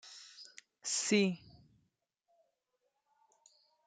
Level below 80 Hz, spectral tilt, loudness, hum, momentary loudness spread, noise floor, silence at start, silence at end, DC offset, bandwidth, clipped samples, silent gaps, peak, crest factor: -80 dBFS; -3.5 dB/octave; -33 LUFS; none; 22 LU; -83 dBFS; 0.05 s; 2.5 s; under 0.1%; 9.6 kHz; under 0.1%; none; -16 dBFS; 24 dB